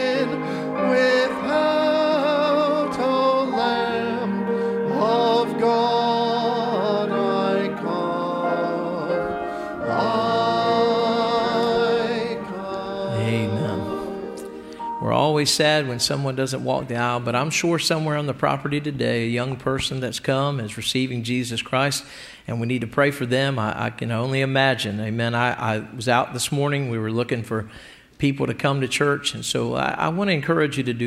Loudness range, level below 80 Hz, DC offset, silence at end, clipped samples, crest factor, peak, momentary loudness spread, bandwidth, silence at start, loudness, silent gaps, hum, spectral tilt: 3 LU; -56 dBFS; under 0.1%; 0 s; under 0.1%; 18 dB; -4 dBFS; 7 LU; 15.5 kHz; 0 s; -22 LUFS; none; none; -5 dB/octave